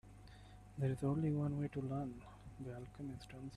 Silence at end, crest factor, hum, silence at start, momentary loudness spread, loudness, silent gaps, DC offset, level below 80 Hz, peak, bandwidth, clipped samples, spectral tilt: 0 s; 16 dB; 50 Hz at -60 dBFS; 0.05 s; 21 LU; -42 LUFS; none; under 0.1%; -62 dBFS; -26 dBFS; 11.5 kHz; under 0.1%; -8.5 dB/octave